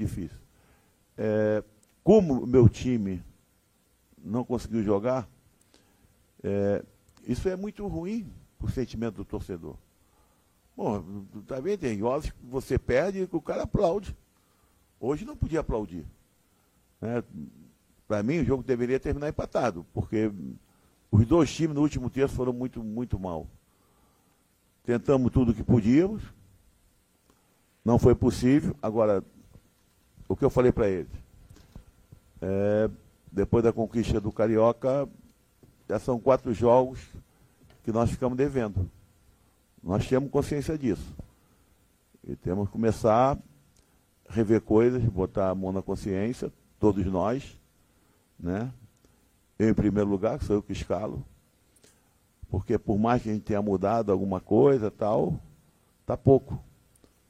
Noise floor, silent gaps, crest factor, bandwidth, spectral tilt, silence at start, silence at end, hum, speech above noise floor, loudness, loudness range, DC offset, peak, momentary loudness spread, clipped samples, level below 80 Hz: -67 dBFS; none; 22 dB; 15 kHz; -8 dB/octave; 0 s; 0.65 s; none; 41 dB; -27 LUFS; 7 LU; under 0.1%; -6 dBFS; 16 LU; under 0.1%; -46 dBFS